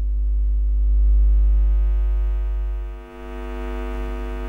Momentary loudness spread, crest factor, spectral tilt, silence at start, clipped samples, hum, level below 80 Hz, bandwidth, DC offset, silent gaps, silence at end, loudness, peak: 14 LU; 8 dB; -9 dB/octave; 0 s; under 0.1%; none; -20 dBFS; 3.1 kHz; under 0.1%; none; 0 s; -23 LUFS; -10 dBFS